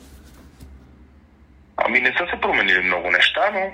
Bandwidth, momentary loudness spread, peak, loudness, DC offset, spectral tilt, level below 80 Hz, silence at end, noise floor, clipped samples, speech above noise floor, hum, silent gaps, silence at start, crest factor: 16 kHz; 6 LU; -4 dBFS; -18 LUFS; under 0.1%; -3.5 dB/octave; -48 dBFS; 0 s; -50 dBFS; under 0.1%; 31 dB; none; none; 0.1 s; 18 dB